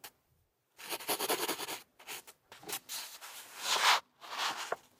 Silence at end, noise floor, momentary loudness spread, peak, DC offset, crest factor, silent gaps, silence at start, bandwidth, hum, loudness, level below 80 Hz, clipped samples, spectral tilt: 0.2 s; -75 dBFS; 19 LU; -14 dBFS; under 0.1%; 24 dB; none; 0.05 s; 16 kHz; none; -34 LUFS; -86 dBFS; under 0.1%; 0.5 dB/octave